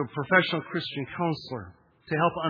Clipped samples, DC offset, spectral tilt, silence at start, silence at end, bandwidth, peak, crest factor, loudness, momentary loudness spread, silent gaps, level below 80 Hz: under 0.1%; under 0.1%; -7.5 dB/octave; 0 s; 0 s; 5.2 kHz; -6 dBFS; 24 dB; -27 LUFS; 12 LU; none; -64 dBFS